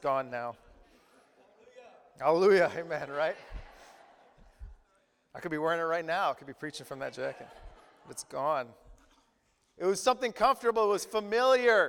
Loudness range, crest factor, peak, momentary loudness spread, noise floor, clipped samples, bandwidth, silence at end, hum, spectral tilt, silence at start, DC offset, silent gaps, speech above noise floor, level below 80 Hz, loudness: 6 LU; 20 dB; -12 dBFS; 20 LU; -72 dBFS; under 0.1%; 17.5 kHz; 0 s; none; -4 dB/octave; 0.05 s; under 0.1%; none; 43 dB; -58 dBFS; -30 LUFS